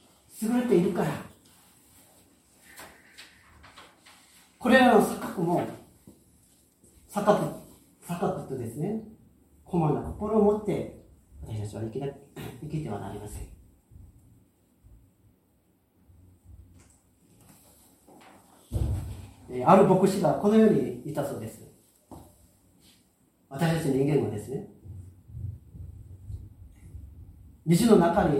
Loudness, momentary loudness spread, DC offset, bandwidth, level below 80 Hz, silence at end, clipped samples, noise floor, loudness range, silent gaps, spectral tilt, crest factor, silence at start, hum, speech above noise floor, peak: -26 LUFS; 27 LU; under 0.1%; 16 kHz; -50 dBFS; 0 s; under 0.1%; -67 dBFS; 15 LU; none; -6.5 dB/octave; 24 dB; 0.35 s; none; 43 dB; -4 dBFS